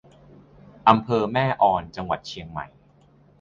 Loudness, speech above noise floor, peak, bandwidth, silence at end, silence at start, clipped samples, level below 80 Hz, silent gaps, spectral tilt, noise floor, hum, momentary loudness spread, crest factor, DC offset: -22 LUFS; 34 dB; -2 dBFS; 7.6 kHz; 0.75 s; 0.85 s; under 0.1%; -52 dBFS; none; -7 dB/octave; -56 dBFS; none; 16 LU; 24 dB; under 0.1%